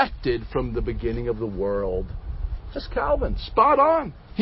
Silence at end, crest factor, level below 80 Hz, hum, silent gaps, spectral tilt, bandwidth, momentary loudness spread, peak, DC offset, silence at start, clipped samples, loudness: 0 s; 20 dB; -32 dBFS; none; none; -11 dB/octave; 5.8 kHz; 15 LU; -4 dBFS; under 0.1%; 0 s; under 0.1%; -24 LUFS